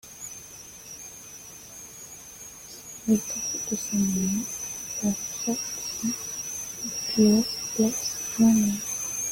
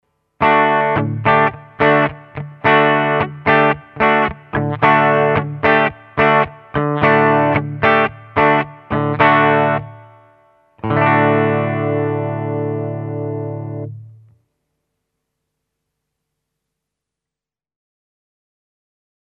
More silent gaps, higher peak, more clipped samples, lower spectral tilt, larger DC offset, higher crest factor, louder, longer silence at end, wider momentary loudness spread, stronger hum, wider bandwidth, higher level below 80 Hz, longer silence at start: neither; second, -8 dBFS vs 0 dBFS; neither; second, -3.5 dB/octave vs -9 dB/octave; neither; about the same, 20 dB vs 16 dB; second, -26 LUFS vs -15 LUFS; second, 0 s vs 5.25 s; first, 20 LU vs 11 LU; neither; first, 17 kHz vs 5.8 kHz; second, -58 dBFS vs -48 dBFS; second, 0.05 s vs 0.4 s